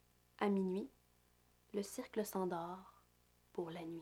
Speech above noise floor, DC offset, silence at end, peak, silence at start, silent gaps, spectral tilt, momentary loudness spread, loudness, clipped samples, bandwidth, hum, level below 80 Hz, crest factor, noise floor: 32 dB; under 0.1%; 0 s; -22 dBFS; 0.4 s; none; -6 dB/octave; 12 LU; -43 LUFS; under 0.1%; 17 kHz; 60 Hz at -70 dBFS; -76 dBFS; 22 dB; -73 dBFS